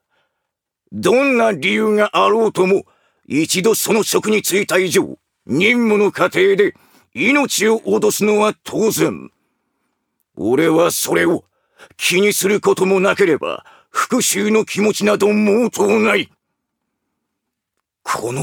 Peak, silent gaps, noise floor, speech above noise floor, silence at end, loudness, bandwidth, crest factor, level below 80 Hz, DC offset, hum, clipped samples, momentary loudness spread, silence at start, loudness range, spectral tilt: 0 dBFS; none; -78 dBFS; 63 dB; 0 s; -15 LUFS; 20 kHz; 16 dB; -64 dBFS; under 0.1%; none; under 0.1%; 8 LU; 0.9 s; 3 LU; -4 dB/octave